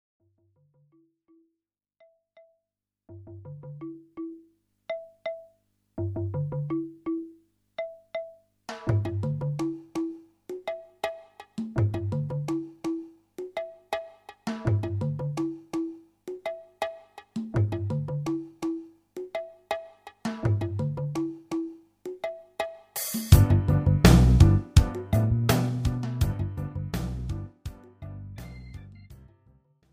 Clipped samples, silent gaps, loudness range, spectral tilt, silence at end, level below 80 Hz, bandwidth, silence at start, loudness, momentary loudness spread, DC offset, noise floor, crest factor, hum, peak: under 0.1%; none; 17 LU; -6.5 dB/octave; 0.8 s; -36 dBFS; 16 kHz; 3.1 s; -28 LUFS; 21 LU; under 0.1%; -85 dBFS; 26 dB; none; -2 dBFS